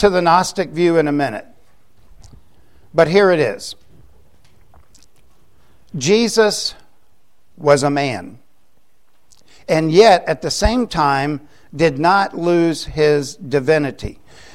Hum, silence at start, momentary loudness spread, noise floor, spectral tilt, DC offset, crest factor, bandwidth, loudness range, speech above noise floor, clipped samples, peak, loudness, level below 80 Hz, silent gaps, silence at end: none; 0 s; 16 LU; -63 dBFS; -5 dB/octave; 0.7%; 18 dB; 15.5 kHz; 5 LU; 47 dB; under 0.1%; 0 dBFS; -16 LUFS; -38 dBFS; none; 0.4 s